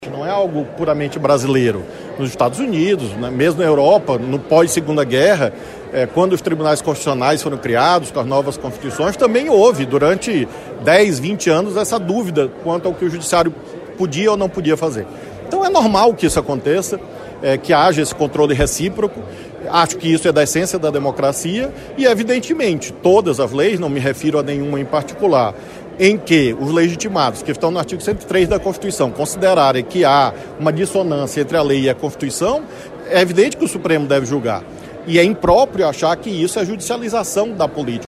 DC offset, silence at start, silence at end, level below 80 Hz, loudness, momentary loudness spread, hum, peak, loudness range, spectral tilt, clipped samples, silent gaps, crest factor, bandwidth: under 0.1%; 0 s; 0 s; -42 dBFS; -16 LUFS; 9 LU; none; 0 dBFS; 2 LU; -5 dB/octave; under 0.1%; none; 16 dB; 15 kHz